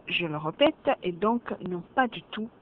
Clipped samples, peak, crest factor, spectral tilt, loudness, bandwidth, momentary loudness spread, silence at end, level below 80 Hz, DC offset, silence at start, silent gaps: under 0.1%; -10 dBFS; 20 dB; -8.5 dB/octave; -28 LUFS; 5.6 kHz; 10 LU; 0.15 s; -62 dBFS; under 0.1%; 0.05 s; none